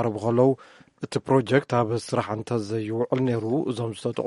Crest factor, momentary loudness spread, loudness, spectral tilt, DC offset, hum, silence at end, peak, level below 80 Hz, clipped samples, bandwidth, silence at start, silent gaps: 18 dB; 9 LU; -25 LUFS; -7 dB/octave; under 0.1%; none; 0 s; -6 dBFS; -64 dBFS; under 0.1%; 11.5 kHz; 0 s; none